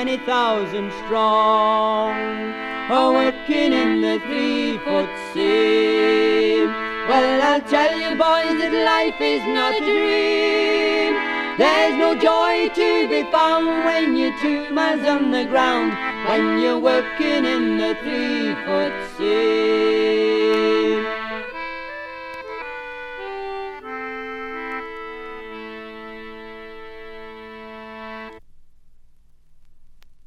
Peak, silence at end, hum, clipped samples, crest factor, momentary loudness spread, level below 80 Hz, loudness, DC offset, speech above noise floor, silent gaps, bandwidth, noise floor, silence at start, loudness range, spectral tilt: -4 dBFS; 0.05 s; none; under 0.1%; 16 dB; 17 LU; -52 dBFS; -19 LUFS; under 0.1%; 29 dB; none; 11.5 kHz; -48 dBFS; 0 s; 16 LU; -4.5 dB/octave